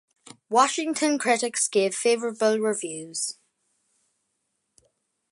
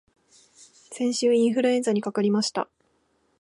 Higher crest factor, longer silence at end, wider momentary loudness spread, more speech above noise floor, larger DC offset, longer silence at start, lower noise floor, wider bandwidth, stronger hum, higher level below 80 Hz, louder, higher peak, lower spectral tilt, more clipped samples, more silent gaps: first, 22 dB vs 16 dB; first, 2 s vs 0.75 s; about the same, 9 LU vs 11 LU; first, 53 dB vs 45 dB; neither; second, 0.5 s vs 0.9 s; first, -77 dBFS vs -68 dBFS; about the same, 11.5 kHz vs 11.5 kHz; neither; second, -82 dBFS vs -76 dBFS; about the same, -24 LUFS vs -24 LUFS; first, -6 dBFS vs -10 dBFS; second, -2 dB/octave vs -4.5 dB/octave; neither; neither